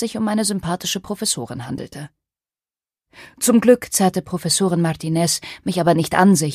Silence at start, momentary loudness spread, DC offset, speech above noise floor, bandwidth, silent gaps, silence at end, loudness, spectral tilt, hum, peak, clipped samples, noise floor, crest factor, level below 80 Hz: 0 s; 15 LU; under 0.1%; over 71 dB; 15.5 kHz; none; 0 s; -19 LUFS; -4.5 dB/octave; none; 0 dBFS; under 0.1%; under -90 dBFS; 18 dB; -54 dBFS